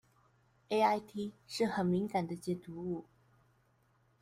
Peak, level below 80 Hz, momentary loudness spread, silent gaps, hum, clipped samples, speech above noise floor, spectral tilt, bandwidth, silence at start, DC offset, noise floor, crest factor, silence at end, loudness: -18 dBFS; -74 dBFS; 11 LU; none; none; under 0.1%; 37 dB; -6 dB/octave; 15.5 kHz; 0.7 s; under 0.1%; -72 dBFS; 20 dB; 1.2 s; -35 LUFS